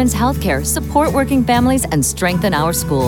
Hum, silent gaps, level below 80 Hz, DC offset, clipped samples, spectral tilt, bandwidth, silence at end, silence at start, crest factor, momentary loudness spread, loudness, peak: none; none; -30 dBFS; under 0.1%; under 0.1%; -5 dB/octave; 18 kHz; 0 s; 0 s; 12 dB; 3 LU; -15 LUFS; -2 dBFS